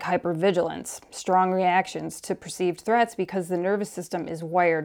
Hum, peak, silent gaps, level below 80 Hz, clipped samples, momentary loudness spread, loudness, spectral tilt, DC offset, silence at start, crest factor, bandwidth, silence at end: none; -10 dBFS; none; -66 dBFS; under 0.1%; 10 LU; -25 LUFS; -5 dB/octave; under 0.1%; 0 s; 16 dB; 18 kHz; 0 s